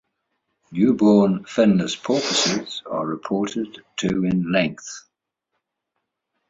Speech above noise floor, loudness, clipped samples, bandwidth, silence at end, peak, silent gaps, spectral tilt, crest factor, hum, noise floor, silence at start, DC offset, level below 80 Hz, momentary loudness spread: 58 dB; -21 LUFS; under 0.1%; 8 kHz; 1.5 s; -4 dBFS; none; -5 dB/octave; 18 dB; none; -79 dBFS; 0.7 s; under 0.1%; -58 dBFS; 14 LU